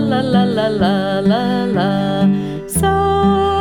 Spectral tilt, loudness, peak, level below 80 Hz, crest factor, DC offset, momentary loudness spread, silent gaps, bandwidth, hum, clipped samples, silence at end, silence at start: -6 dB/octave; -15 LUFS; -2 dBFS; -36 dBFS; 14 dB; under 0.1%; 3 LU; none; 19 kHz; none; under 0.1%; 0 s; 0 s